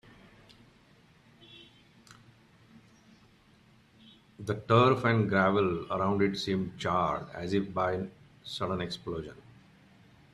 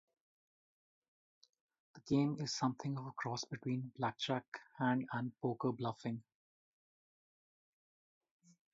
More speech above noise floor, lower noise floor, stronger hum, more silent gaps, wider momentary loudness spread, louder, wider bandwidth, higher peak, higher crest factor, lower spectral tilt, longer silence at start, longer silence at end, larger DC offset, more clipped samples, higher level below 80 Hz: second, 32 dB vs over 51 dB; second, -61 dBFS vs under -90 dBFS; neither; second, none vs 4.48-4.52 s; first, 18 LU vs 8 LU; first, -29 LUFS vs -40 LUFS; first, 12 kHz vs 7.6 kHz; first, -10 dBFS vs -22 dBFS; about the same, 22 dB vs 20 dB; first, -6.5 dB/octave vs -5 dB/octave; second, 1.5 s vs 1.95 s; second, 1 s vs 2.5 s; neither; neither; first, -62 dBFS vs -78 dBFS